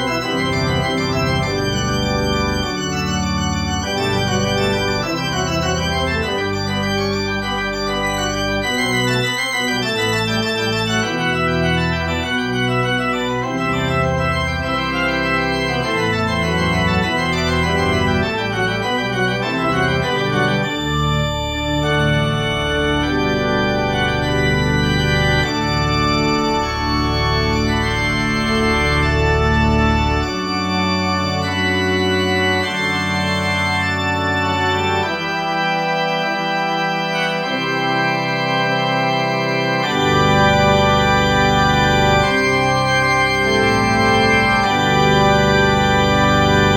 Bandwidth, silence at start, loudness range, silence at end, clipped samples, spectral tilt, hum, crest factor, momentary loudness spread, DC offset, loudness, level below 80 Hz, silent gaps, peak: 17 kHz; 0 s; 4 LU; 0 s; under 0.1%; -5 dB/octave; none; 16 dB; 5 LU; 0.1%; -17 LUFS; -30 dBFS; none; -2 dBFS